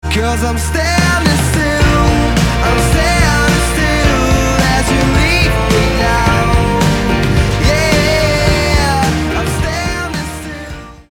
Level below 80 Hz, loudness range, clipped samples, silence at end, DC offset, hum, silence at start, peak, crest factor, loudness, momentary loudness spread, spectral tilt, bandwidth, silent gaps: -18 dBFS; 1 LU; under 0.1%; 0.1 s; under 0.1%; none; 0.05 s; 0 dBFS; 12 dB; -12 LUFS; 6 LU; -5 dB/octave; 18.5 kHz; none